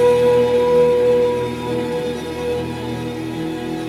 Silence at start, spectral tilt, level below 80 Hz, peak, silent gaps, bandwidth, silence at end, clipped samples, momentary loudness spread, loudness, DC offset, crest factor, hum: 0 s; -6 dB/octave; -48 dBFS; -4 dBFS; none; 13.5 kHz; 0 s; under 0.1%; 11 LU; -18 LUFS; under 0.1%; 12 dB; none